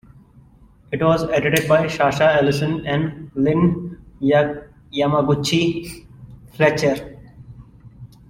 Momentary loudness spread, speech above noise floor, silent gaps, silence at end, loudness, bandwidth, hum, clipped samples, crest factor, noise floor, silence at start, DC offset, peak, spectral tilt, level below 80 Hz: 13 LU; 31 dB; none; 0.25 s; -19 LUFS; 16.5 kHz; none; under 0.1%; 18 dB; -49 dBFS; 0.9 s; under 0.1%; -2 dBFS; -6 dB/octave; -48 dBFS